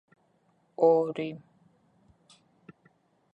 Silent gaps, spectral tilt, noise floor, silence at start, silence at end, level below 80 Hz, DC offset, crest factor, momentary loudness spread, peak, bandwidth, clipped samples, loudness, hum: none; -8 dB/octave; -69 dBFS; 0.8 s; 1.95 s; -78 dBFS; under 0.1%; 22 dB; 25 LU; -10 dBFS; 8.2 kHz; under 0.1%; -27 LUFS; none